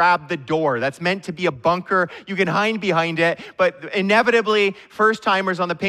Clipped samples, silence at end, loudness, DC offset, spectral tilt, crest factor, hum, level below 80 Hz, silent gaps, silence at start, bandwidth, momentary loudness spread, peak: under 0.1%; 0 s; -20 LUFS; under 0.1%; -5.5 dB/octave; 16 dB; none; -62 dBFS; none; 0 s; 13.5 kHz; 6 LU; -4 dBFS